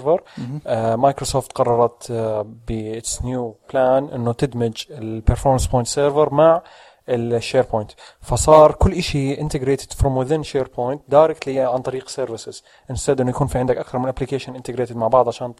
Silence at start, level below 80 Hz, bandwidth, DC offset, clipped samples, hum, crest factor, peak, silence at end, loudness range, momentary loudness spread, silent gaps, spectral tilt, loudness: 0 s; -32 dBFS; 15 kHz; under 0.1%; under 0.1%; none; 18 dB; 0 dBFS; 0.05 s; 6 LU; 12 LU; none; -5.5 dB/octave; -19 LUFS